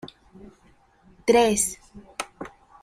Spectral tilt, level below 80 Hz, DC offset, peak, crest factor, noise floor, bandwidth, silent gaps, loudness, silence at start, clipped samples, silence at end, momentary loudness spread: -3 dB/octave; -54 dBFS; under 0.1%; -6 dBFS; 20 dB; -58 dBFS; 16 kHz; none; -23 LUFS; 0.05 s; under 0.1%; 0.35 s; 23 LU